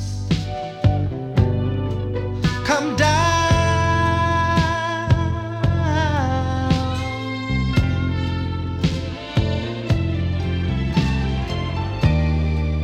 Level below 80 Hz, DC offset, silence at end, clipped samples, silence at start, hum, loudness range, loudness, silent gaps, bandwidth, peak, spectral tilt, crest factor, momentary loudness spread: -30 dBFS; under 0.1%; 0 s; under 0.1%; 0 s; none; 4 LU; -21 LUFS; none; 9.8 kHz; -2 dBFS; -6 dB/octave; 18 dB; 7 LU